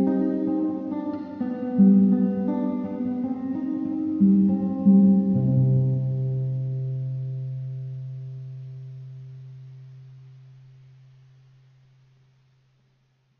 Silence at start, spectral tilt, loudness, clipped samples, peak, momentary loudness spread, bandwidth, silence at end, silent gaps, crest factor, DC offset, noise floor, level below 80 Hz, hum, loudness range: 0 s; -12.5 dB/octave; -23 LUFS; under 0.1%; -8 dBFS; 22 LU; 2.2 kHz; 3.05 s; none; 16 dB; under 0.1%; -66 dBFS; -62 dBFS; none; 19 LU